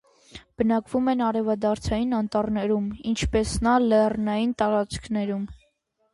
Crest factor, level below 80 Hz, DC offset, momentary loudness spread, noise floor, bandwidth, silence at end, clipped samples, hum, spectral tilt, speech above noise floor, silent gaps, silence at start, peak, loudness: 16 dB; -42 dBFS; under 0.1%; 7 LU; -69 dBFS; 11.5 kHz; 0.6 s; under 0.1%; none; -6 dB/octave; 45 dB; none; 0.35 s; -8 dBFS; -24 LUFS